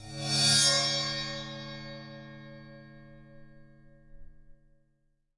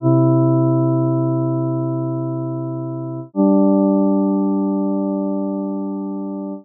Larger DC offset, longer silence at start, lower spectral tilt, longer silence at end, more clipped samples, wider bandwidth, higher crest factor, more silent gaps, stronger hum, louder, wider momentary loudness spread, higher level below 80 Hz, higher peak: neither; about the same, 0 s vs 0 s; second, -1.5 dB/octave vs -6.5 dB/octave; first, 0.85 s vs 0 s; neither; first, 11.5 kHz vs 1.4 kHz; first, 22 dB vs 12 dB; neither; neither; second, -25 LUFS vs -19 LUFS; first, 26 LU vs 11 LU; first, -58 dBFS vs -80 dBFS; second, -12 dBFS vs -6 dBFS